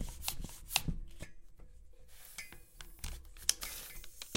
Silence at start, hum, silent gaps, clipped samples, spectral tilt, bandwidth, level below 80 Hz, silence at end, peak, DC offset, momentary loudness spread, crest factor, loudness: 0 s; none; none; under 0.1%; -1.5 dB/octave; 17 kHz; -48 dBFS; 0 s; -6 dBFS; under 0.1%; 20 LU; 36 dB; -40 LUFS